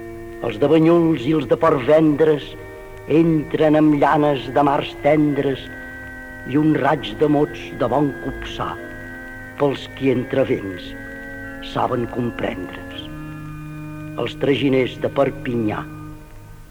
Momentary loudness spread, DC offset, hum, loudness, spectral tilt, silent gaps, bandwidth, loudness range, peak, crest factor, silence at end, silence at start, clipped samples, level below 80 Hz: 18 LU; under 0.1%; none; -19 LUFS; -7.5 dB/octave; none; 16 kHz; 8 LU; -4 dBFS; 16 dB; 0.05 s; 0 s; under 0.1%; -42 dBFS